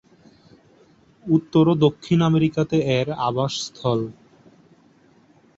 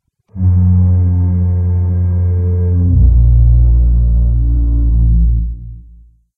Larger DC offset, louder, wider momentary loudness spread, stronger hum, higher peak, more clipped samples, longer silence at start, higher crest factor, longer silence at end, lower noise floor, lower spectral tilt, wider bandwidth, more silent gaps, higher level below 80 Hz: neither; second, -21 LUFS vs -13 LUFS; about the same, 8 LU vs 6 LU; neither; second, -4 dBFS vs 0 dBFS; neither; first, 1.25 s vs 0.35 s; first, 18 dB vs 10 dB; first, 1.45 s vs 0.55 s; first, -55 dBFS vs -42 dBFS; second, -7 dB/octave vs -14 dB/octave; first, 7.8 kHz vs 1.7 kHz; neither; second, -56 dBFS vs -14 dBFS